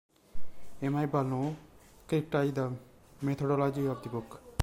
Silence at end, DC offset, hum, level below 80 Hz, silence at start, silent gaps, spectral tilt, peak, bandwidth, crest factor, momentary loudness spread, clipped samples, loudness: 0 s; under 0.1%; none; -56 dBFS; 0.35 s; none; -7.5 dB/octave; -14 dBFS; 16 kHz; 18 dB; 11 LU; under 0.1%; -33 LUFS